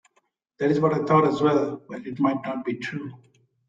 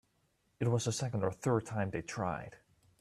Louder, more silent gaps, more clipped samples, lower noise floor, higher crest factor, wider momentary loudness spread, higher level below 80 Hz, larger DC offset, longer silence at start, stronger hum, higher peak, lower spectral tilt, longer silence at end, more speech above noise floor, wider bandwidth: first, -23 LUFS vs -36 LUFS; neither; neither; second, -70 dBFS vs -76 dBFS; about the same, 18 dB vs 18 dB; first, 16 LU vs 6 LU; about the same, -66 dBFS vs -64 dBFS; neither; about the same, 0.6 s vs 0.6 s; neither; first, -6 dBFS vs -18 dBFS; first, -8 dB/octave vs -5.5 dB/octave; about the same, 0.5 s vs 0.45 s; first, 46 dB vs 41 dB; second, 7.8 kHz vs 13 kHz